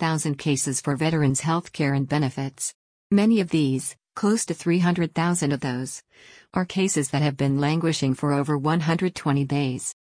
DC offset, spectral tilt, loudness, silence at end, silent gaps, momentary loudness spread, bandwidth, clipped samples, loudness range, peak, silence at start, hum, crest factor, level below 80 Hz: under 0.1%; -5.5 dB/octave; -24 LUFS; 0.1 s; 2.74-3.10 s; 7 LU; 10.5 kHz; under 0.1%; 1 LU; -10 dBFS; 0 s; none; 14 dB; -58 dBFS